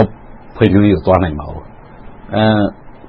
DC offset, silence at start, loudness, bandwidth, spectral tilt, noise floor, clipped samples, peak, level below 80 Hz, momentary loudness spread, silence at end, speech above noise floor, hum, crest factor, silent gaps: under 0.1%; 0 s; -14 LUFS; 5.2 kHz; -10 dB/octave; -35 dBFS; under 0.1%; 0 dBFS; -34 dBFS; 15 LU; 0 s; 23 dB; none; 14 dB; none